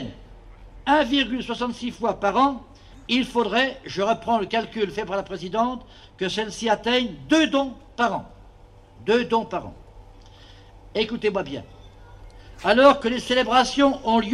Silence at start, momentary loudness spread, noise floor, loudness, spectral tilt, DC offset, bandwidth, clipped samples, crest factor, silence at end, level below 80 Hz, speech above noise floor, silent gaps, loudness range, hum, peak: 0 s; 13 LU; -49 dBFS; -23 LUFS; -4 dB/octave; under 0.1%; 12 kHz; under 0.1%; 20 dB; 0 s; -48 dBFS; 26 dB; none; 6 LU; none; -2 dBFS